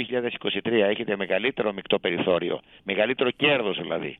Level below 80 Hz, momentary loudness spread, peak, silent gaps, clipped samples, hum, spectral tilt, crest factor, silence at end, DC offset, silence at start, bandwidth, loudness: -64 dBFS; 7 LU; -6 dBFS; none; under 0.1%; none; -8 dB/octave; 18 dB; 0.05 s; under 0.1%; 0 s; 4.2 kHz; -25 LUFS